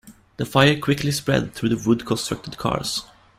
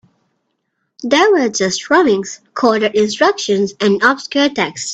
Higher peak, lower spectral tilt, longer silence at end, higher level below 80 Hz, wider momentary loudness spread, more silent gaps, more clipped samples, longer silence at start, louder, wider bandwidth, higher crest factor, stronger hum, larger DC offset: about the same, -2 dBFS vs 0 dBFS; first, -5 dB/octave vs -3.5 dB/octave; first, 0.35 s vs 0 s; first, -48 dBFS vs -58 dBFS; first, 10 LU vs 6 LU; neither; neither; second, 0.05 s vs 1 s; second, -22 LUFS vs -14 LUFS; first, 16 kHz vs 9 kHz; about the same, 20 dB vs 16 dB; neither; neither